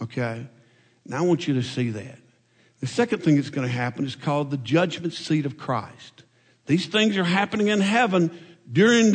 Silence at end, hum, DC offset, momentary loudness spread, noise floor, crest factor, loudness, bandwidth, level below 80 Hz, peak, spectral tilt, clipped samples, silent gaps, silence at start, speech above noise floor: 0 s; none; under 0.1%; 12 LU; -61 dBFS; 16 dB; -23 LUFS; 9.4 kHz; -68 dBFS; -6 dBFS; -5.5 dB/octave; under 0.1%; none; 0 s; 38 dB